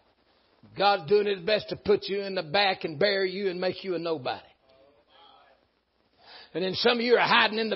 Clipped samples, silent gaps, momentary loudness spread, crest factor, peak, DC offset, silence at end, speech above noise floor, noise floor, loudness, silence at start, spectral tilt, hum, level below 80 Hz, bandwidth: under 0.1%; none; 11 LU; 20 dB; -6 dBFS; under 0.1%; 0 s; 44 dB; -70 dBFS; -26 LUFS; 0.75 s; -1.5 dB/octave; none; -66 dBFS; 6 kHz